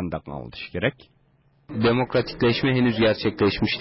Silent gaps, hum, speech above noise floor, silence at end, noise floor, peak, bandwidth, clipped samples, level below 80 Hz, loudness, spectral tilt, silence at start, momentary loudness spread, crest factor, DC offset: none; none; 39 dB; 0 s; -61 dBFS; -8 dBFS; 5.8 kHz; under 0.1%; -46 dBFS; -23 LUFS; -10 dB/octave; 0 s; 13 LU; 14 dB; under 0.1%